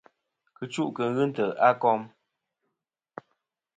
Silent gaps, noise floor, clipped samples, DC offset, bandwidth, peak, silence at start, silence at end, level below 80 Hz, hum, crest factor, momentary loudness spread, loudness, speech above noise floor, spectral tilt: none; -84 dBFS; under 0.1%; under 0.1%; 9.4 kHz; -6 dBFS; 0.6 s; 1.7 s; -78 dBFS; none; 24 dB; 25 LU; -26 LUFS; 59 dB; -6.5 dB/octave